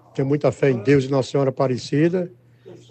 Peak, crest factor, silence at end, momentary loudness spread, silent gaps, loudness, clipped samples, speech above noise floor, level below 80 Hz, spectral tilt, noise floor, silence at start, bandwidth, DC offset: -4 dBFS; 16 dB; 0.15 s; 5 LU; none; -20 LUFS; under 0.1%; 26 dB; -62 dBFS; -7.5 dB/octave; -45 dBFS; 0.15 s; 8.6 kHz; under 0.1%